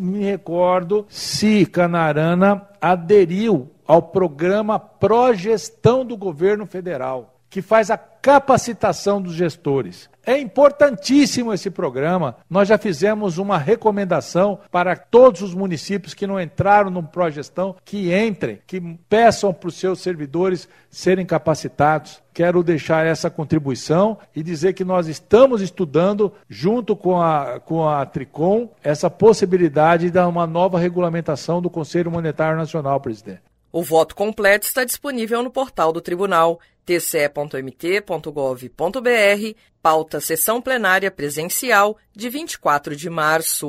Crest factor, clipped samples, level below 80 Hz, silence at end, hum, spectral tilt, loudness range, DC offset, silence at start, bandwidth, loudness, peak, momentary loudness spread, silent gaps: 18 dB; under 0.1%; -54 dBFS; 0 s; none; -5.5 dB/octave; 3 LU; under 0.1%; 0 s; 16 kHz; -18 LUFS; 0 dBFS; 10 LU; none